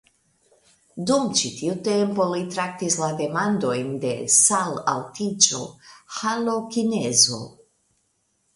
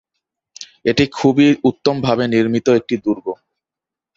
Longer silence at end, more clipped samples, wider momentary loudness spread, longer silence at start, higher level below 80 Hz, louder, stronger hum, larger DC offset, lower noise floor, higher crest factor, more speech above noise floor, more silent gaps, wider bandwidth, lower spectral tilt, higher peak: first, 1.05 s vs 0.85 s; neither; second, 13 LU vs 16 LU; first, 0.95 s vs 0.6 s; second, -64 dBFS vs -52 dBFS; second, -21 LUFS vs -16 LUFS; neither; neither; second, -70 dBFS vs -87 dBFS; first, 22 dB vs 16 dB; second, 47 dB vs 72 dB; neither; first, 11.5 kHz vs 7.8 kHz; second, -2.5 dB/octave vs -6 dB/octave; about the same, -2 dBFS vs -2 dBFS